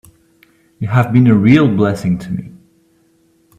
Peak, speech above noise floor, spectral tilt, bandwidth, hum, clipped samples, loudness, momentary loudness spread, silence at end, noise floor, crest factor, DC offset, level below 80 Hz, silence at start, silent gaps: 0 dBFS; 43 dB; -8.5 dB/octave; 12.5 kHz; none; under 0.1%; -13 LUFS; 16 LU; 1.1 s; -55 dBFS; 14 dB; under 0.1%; -48 dBFS; 0.8 s; none